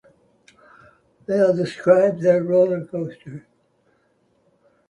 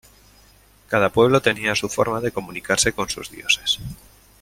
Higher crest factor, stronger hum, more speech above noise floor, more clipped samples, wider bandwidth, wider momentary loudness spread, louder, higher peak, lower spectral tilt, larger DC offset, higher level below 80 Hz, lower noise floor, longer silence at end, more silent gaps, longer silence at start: about the same, 20 dB vs 20 dB; neither; first, 45 dB vs 32 dB; neither; second, 10 kHz vs 16.5 kHz; first, 23 LU vs 11 LU; about the same, -19 LUFS vs -20 LUFS; about the same, -2 dBFS vs -2 dBFS; first, -7.5 dB/octave vs -3 dB/octave; neither; second, -66 dBFS vs -48 dBFS; first, -64 dBFS vs -53 dBFS; first, 1.5 s vs 0.45 s; neither; first, 1.3 s vs 0.9 s